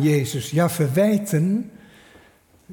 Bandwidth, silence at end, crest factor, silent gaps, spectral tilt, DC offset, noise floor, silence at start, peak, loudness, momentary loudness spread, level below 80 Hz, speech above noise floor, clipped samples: 18.5 kHz; 0 s; 14 dB; none; -6.5 dB/octave; under 0.1%; -54 dBFS; 0 s; -8 dBFS; -21 LUFS; 6 LU; -60 dBFS; 35 dB; under 0.1%